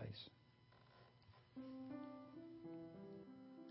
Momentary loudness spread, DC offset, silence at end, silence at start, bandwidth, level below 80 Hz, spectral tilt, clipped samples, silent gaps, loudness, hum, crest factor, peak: 15 LU; under 0.1%; 0 s; 0 s; 5.6 kHz; -80 dBFS; -5.5 dB/octave; under 0.1%; none; -57 LUFS; none; 18 dB; -40 dBFS